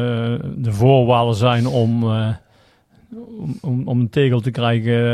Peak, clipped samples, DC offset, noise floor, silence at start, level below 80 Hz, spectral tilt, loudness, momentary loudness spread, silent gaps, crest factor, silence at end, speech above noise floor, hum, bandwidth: -2 dBFS; under 0.1%; under 0.1%; -55 dBFS; 0 s; -50 dBFS; -8 dB/octave; -18 LUFS; 15 LU; none; 14 dB; 0 s; 38 dB; none; 10.5 kHz